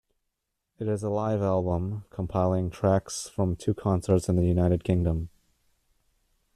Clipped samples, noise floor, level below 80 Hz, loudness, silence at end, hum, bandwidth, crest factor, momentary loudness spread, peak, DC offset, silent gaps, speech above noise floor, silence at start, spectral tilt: under 0.1%; -81 dBFS; -48 dBFS; -27 LUFS; 1.3 s; none; 13 kHz; 18 dB; 9 LU; -10 dBFS; under 0.1%; none; 56 dB; 0.8 s; -7.5 dB/octave